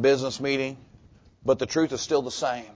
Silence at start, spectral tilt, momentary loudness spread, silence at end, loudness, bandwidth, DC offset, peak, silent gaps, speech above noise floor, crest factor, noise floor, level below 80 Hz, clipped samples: 0 s; -4.5 dB/octave; 8 LU; 0.05 s; -26 LUFS; 8 kHz; under 0.1%; -10 dBFS; none; 29 dB; 16 dB; -54 dBFS; -58 dBFS; under 0.1%